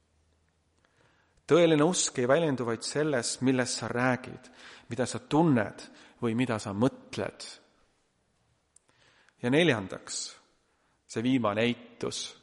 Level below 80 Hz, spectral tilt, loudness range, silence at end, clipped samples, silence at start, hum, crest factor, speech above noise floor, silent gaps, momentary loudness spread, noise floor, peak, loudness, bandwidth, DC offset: -68 dBFS; -4.5 dB/octave; 7 LU; 0.1 s; under 0.1%; 1.5 s; none; 20 dB; 44 dB; none; 15 LU; -72 dBFS; -10 dBFS; -28 LUFS; 11.5 kHz; under 0.1%